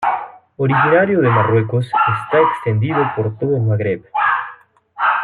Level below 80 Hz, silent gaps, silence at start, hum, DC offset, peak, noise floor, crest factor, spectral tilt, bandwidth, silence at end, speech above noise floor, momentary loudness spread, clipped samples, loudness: -58 dBFS; none; 0 s; none; under 0.1%; -2 dBFS; -42 dBFS; 14 dB; -9 dB/octave; 10.5 kHz; 0 s; 27 dB; 8 LU; under 0.1%; -16 LUFS